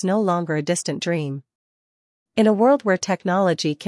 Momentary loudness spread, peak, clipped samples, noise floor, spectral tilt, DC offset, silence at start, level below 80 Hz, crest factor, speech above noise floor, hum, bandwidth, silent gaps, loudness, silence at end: 9 LU; -4 dBFS; under 0.1%; under -90 dBFS; -5.5 dB/octave; under 0.1%; 0 s; -70 dBFS; 16 dB; over 70 dB; none; 12 kHz; 1.55-2.26 s; -21 LUFS; 0 s